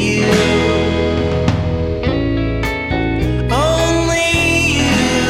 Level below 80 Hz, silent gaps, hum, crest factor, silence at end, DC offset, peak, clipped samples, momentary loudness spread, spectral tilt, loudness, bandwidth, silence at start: -26 dBFS; none; none; 14 dB; 0 s; under 0.1%; 0 dBFS; under 0.1%; 6 LU; -5 dB/octave; -15 LUFS; 16 kHz; 0 s